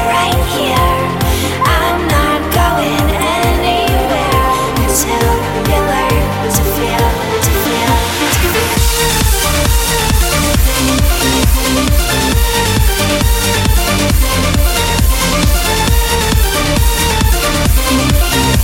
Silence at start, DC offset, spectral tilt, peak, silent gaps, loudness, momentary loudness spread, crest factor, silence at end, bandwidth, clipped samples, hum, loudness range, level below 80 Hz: 0 s; under 0.1%; -4 dB/octave; 0 dBFS; none; -12 LUFS; 2 LU; 12 dB; 0 s; 17 kHz; under 0.1%; none; 1 LU; -16 dBFS